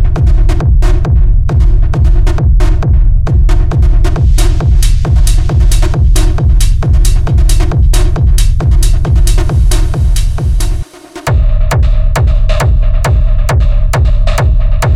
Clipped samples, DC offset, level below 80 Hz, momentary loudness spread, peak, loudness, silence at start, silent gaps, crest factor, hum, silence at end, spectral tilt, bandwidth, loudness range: under 0.1%; 2%; -8 dBFS; 2 LU; 0 dBFS; -11 LUFS; 0 s; none; 6 dB; none; 0 s; -6 dB/octave; 13.5 kHz; 2 LU